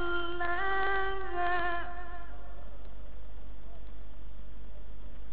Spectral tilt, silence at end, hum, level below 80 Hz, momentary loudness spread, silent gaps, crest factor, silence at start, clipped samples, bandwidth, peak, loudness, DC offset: -2.5 dB/octave; 0 s; none; -46 dBFS; 20 LU; none; 18 dB; 0 s; under 0.1%; 5 kHz; -16 dBFS; -33 LUFS; 4%